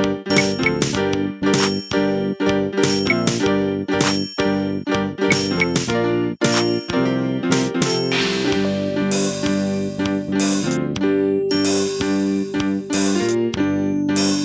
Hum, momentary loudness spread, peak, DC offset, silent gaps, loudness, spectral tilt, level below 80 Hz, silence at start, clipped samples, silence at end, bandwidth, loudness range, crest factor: none; 3 LU; -2 dBFS; under 0.1%; none; -19 LUFS; -4.5 dB/octave; -46 dBFS; 0 s; under 0.1%; 0 s; 8 kHz; 1 LU; 16 dB